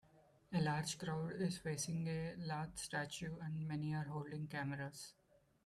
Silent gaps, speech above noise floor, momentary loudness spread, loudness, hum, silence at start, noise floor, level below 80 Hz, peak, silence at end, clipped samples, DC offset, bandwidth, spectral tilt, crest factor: none; 27 dB; 6 LU; -43 LUFS; none; 0.15 s; -70 dBFS; -70 dBFS; -28 dBFS; 0.55 s; under 0.1%; under 0.1%; 13.5 kHz; -5 dB/octave; 16 dB